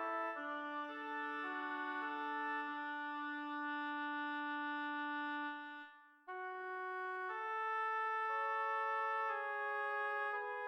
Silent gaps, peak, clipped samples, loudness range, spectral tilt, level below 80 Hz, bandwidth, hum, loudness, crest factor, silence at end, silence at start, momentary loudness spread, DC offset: none; -28 dBFS; under 0.1%; 5 LU; -2.5 dB/octave; under -90 dBFS; 14 kHz; none; -41 LUFS; 12 dB; 0 s; 0 s; 7 LU; under 0.1%